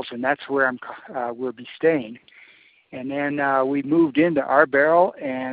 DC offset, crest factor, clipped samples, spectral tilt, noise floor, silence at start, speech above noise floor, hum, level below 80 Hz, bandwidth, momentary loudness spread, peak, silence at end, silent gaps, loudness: under 0.1%; 20 dB; under 0.1%; -4.5 dB/octave; -53 dBFS; 0 s; 31 dB; none; -66 dBFS; 4.8 kHz; 15 LU; -2 dBFS; 0 s; none; -21 LUFS